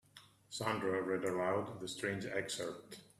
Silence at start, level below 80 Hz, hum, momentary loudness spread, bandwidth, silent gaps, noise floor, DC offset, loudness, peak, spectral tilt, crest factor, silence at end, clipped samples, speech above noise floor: 0.15 s; -76 dBFS; none; 8 LU; 14.5 kHz; none; -63 dBFS; under 0.1%; -39 LUFS; -20 dBFS; -4.5 dB/octave; 20 dB; 0.15 s; under 0.1%; 24 dB